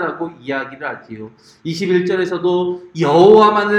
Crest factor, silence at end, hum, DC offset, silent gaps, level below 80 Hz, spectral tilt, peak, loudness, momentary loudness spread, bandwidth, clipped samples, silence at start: 16 dB; 0 s; none; under 0.1%; none; -60 dBFS; -6.5 dB/octave; 0 dBFS; -14 LUFS; 21 LU; 9.4 kHz; under 0.1%; 0 s